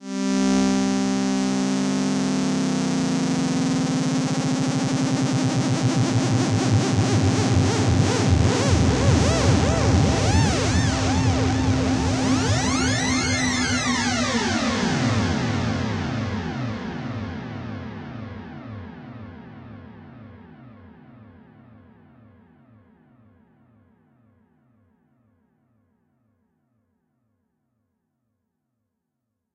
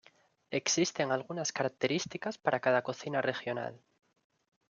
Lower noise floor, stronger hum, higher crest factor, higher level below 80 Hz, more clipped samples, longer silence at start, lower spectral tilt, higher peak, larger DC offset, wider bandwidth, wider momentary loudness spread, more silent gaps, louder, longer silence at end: first, -79 dBFS vs -66 dBFS; neither; about the same, 18 dB vs 22 dB; first, -38 dBFS vs -78 dBFS; neither; second, 0 s vs 0.5 s; first, -5 dB/octave vs -3.5 dB/octave; first, -4 dBFS vs -12 dBFS; neither; first, 11.5 kHz vs 10 kHz; first, 15 LU vs 8 LU; neither; first, -21 LUFS vs -33 LUFS; first, 8.85 s vs 0.95 s